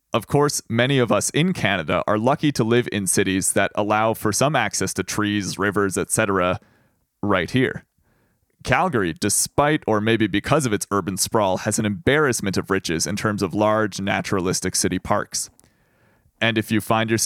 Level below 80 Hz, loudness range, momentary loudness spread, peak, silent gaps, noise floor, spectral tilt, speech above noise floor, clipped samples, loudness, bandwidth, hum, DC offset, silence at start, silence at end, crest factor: -50 dBFS; 3 LU; 4 LU; 0 dBFS; none; -64 dBFS; -4 dB/octave; 44 dB; under 0.1%; -21 LUFS; 17.5 kHz; none; under 0.1%; 0.15 s; 0 s; 20 dB